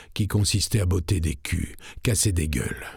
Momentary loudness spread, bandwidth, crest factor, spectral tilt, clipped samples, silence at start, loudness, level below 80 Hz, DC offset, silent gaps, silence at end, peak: 7 LU; 18 kHz; 18 dB; -4.5 dB/octave; under 0.1%; 0 s; -25 LUFS; -38 dBFS; under 0.1%; none; 0 s; -6 dBFS